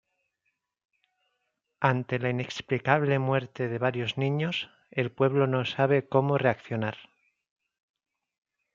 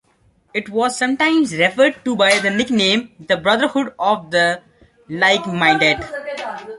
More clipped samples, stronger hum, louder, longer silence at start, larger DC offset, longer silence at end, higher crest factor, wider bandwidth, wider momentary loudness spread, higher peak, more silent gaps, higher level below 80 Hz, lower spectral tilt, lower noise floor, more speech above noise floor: neither; neither; second, -27 LUFS vs -17 LUFS; first, 1.8 s vs 0.55 s; neither; first, 1.7 s vs 0 s; first, 24 dB vs 16 dB; second, 7.4 kHz vs 11.5 kHz; second, 8 LU vs 12 LU; about the same, -4 dBFS vs -2 dBFS; neither; second, -70 dBFS vs -54 dBFS; first, -7 dB/octave vs -3.5 dB/octave; first, -80 dBFS vs -58 dBFS; first, 53 dB vs 41 dB